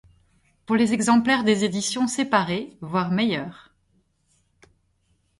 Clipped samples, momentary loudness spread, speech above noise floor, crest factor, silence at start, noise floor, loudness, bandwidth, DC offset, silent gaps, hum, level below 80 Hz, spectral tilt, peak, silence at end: under 0.1%; 9 LU; 45 dB; 20 dB; 0.7 s; -67 dBFS; -22 LUFS; 11.5 kHz; under 0.1%; none; none; -62 dBFS; -4.5 dB/octave; -4 dBFS; 1.85 s